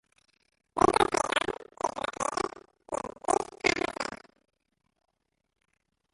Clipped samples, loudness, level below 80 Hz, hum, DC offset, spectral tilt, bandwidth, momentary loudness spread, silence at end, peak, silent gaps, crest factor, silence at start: under 0.1%; -30 LUFS; -58 dBFS; none; under 0.1%; -3 dB/octave; 11.5 kHz; 12 LU; 2 s; -6 dBFS; none; 26 dB; 0.75 s